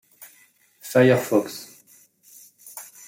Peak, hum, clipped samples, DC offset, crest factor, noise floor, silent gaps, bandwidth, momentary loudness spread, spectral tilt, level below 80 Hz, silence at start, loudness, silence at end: -6 dBFS; none; under 0.1%; under 0.1%; 20 dB; -58 dBFS; none; 16.5 kHz; 25 LU; -5.5 dB/octave; -68 dBFS; 0.85 s; -20 LUFS; 0.25 s